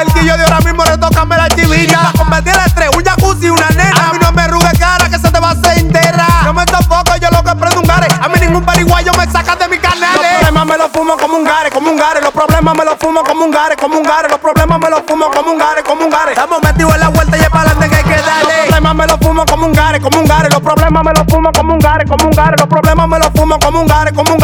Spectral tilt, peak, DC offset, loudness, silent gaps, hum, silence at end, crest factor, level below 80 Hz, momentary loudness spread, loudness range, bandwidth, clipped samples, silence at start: -5 dB/octave; 0 dBFS; under 0.1%; -9 LUFS; none; none; 0 s; 8 dB; -18 dBFS; 3 LU; 2 LU; over 20 kHz; 0.2%; 0 s